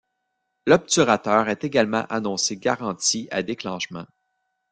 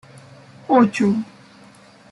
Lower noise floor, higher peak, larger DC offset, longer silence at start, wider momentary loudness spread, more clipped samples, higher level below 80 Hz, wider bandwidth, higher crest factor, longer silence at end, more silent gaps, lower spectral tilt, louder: first, -77 dBFS vs -47 dBFS; about the same, -2 dBFS vs -4 dBFS; neither; about the same, 0.65 s vs 0.7 s; second, 11 LU vs 21 LU; neither; about the same, -62 dBFS vs -64 dBFS; about the same, 10.5 kHz vs 11.5 kHz; about the same, 22 dB vs 18 dB; second, 0.65 s vs 0.85 s; neither; second, -3.5 dB/octave vs -7 dB/octave; second, -22 LUFS vs -18 LUFS